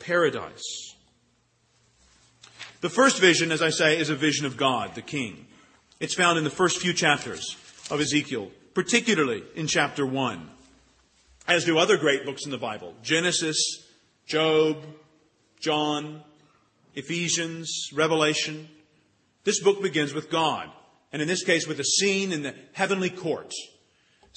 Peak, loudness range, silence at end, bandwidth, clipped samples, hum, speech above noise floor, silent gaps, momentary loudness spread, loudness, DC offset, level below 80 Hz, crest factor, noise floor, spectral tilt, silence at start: -4 dBFS; 5 LU; 0.7 s; 8.8 kHz; under 0.1%; none; 42 dB; none; 14 LU; -24 LUFS; under 0.1%; -68 dBFS; 22 dB; -67 dBFS; -3 dB/octave; 0 s